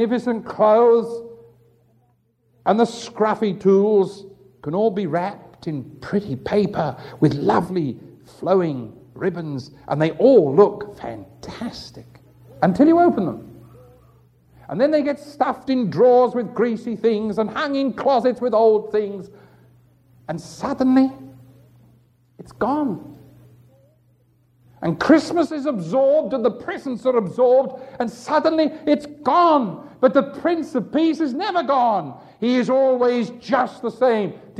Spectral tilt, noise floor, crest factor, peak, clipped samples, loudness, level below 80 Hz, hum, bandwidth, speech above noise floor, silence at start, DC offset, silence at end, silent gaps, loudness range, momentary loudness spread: -7 dB/octave; -63 dBFS; 20 dB; 0 dBFS; under 0.1%; -19 LUFS; -58 dBFS; none; 10.5 kHz; 44 dB; 0 s; under 0.1%; 0 s; none; 5 LU; 16 LU